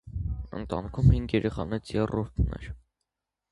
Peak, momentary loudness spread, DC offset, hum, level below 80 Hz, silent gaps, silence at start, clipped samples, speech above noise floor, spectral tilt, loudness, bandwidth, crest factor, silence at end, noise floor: -8 dBFS; 15 LU; under 0.1%; none; -36 dBFS; none; 0.05 s; under 0.1%; 57 dB; -8.5 dB/octave; -29 LUFS; 11 kHz; 20 dB; 0.75 s; -84 dBFS